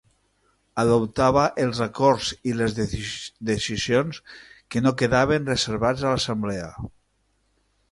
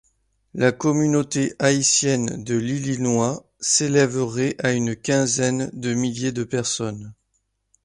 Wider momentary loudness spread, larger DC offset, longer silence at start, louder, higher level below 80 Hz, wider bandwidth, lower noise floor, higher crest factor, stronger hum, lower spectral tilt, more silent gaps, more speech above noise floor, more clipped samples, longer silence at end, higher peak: first, 12 LU vs 8 LU; neither; first, 0.75 s vs 0.55 s; about the same, -23 LUFS vs -21 LUFS; first, -46 dBFS vs -56 dBFS; about the same, 11.5 kHz vs 11.5 kHz; second, -68 dBFS vs -72 dBFS; about the same, 18 dB vs 18 dB; neither; about the same, -5 dB/octave vs -4 dB/octave; neither; second, 46 dB vs 50 dB; neither; first, 1.05 s vs 0.7 s; about the same, -6 dBFS vs -4 dBFS